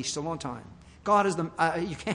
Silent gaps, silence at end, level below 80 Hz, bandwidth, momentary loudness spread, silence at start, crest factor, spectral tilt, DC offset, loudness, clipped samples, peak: none; 0 s; -58 dBFS; 11 kHz; 14 LU; 0 s; 18 dB; -4.5 dB/octave; under 0.1%; -28 LUFS; under 0.1%; -10 dBFS